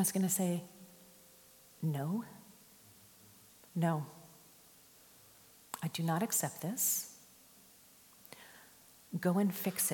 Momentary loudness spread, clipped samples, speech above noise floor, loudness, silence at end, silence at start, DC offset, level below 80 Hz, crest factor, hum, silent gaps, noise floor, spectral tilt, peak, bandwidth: 26 LU; under 0.1%; 27 dB; -35 LUFS; 0 s; 0 s; under 0.1%; -82 dBFS; 20 dB; none; none; -62 dBFS; -4.5 dB/octave; -18 dBFS; 17.5 kHz